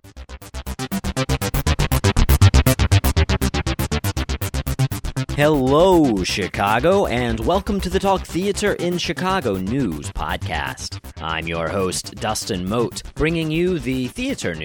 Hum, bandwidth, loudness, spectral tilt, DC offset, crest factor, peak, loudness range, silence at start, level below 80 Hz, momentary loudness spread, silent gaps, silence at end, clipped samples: none; over 20 kHz; -20 LUFS; -5.5 dB/octave; under 0.1%; 18 dB; -2 dBFS; 5 LU; 0.05 s; -28 dBFS; 11 LU; none; 0 s; under 0.1%